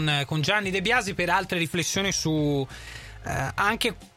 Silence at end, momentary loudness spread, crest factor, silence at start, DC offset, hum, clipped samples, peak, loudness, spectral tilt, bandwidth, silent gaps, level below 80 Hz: 0.1 s; 10 LU; 18 dB; 0 s; under 0.1%; none; under 0.1%; -8 dBFS; -25 LUFS; -4 dB/octave; 16.5 kHz; none; -48 dBFS